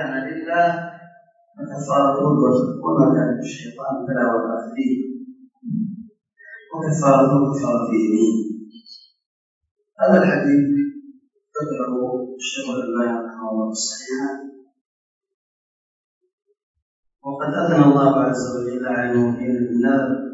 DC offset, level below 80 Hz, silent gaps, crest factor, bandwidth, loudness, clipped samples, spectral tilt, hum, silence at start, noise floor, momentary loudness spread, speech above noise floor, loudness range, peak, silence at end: under 0.1%; -68 dBFS; 9.26-9.61 s, 9.71-9.76 s, 14.81-15.21 s, 15.34-16.21 s, 16.33-16.38 s, 16.63-16.74 s, 16.82-17.03 s; 20 dB; 8 kHz; -20 LUFS; under 0.1%; -6 dB/octave; none; 0 s; -52 dBFS; 15 LU; 33 dB; 8 LU; 0 dBFS; 0 s